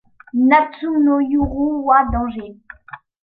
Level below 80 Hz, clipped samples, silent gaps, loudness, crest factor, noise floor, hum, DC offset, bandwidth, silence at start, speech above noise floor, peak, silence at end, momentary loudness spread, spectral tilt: -36 dBFS; under 0.1%; none; -17 LUFS; 16 dB; -40 dBFS; none; under 0.1%; 4.9 kHz; 0.35 s; 24 dB; -2 dBFS; 0.25 s; 20 LU; -10 dB/octave